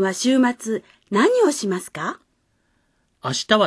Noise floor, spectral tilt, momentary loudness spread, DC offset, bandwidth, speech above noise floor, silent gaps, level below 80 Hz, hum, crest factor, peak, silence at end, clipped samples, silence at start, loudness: -67 dBFS; -4 dB/octave; 12 LU; under 0.1%; 11 kHz; 47 dB; none; -66 dBFS; none; 20 dB; -2 dBFS; 0 s; under 0.1%; 0 s; -21 LUFS